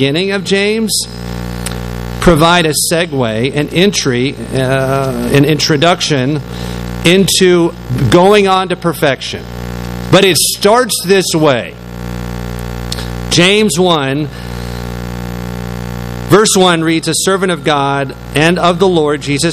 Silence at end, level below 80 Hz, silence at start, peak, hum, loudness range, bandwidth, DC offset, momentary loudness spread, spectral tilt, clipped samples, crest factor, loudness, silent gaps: 0 s; -30 dBFS; 0 s; 0 dBFS; 60 Hz at -25 dBFS; 3 LU; 15.5 kHz; under 0.1%; 14 LU; -4 dB/octave; 0.4%; 12 dB; -11 LUFS; none